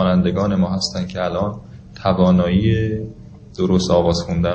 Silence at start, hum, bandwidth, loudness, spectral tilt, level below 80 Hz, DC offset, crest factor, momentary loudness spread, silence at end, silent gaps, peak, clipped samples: 0 s; none; 8.6 kHz; -18 LUFS; -6.5 dB/octave; -34 dBFS; under 0.1%; 16 dB; 11 LU; 0 s; none; -2 dBFS; under 0.1%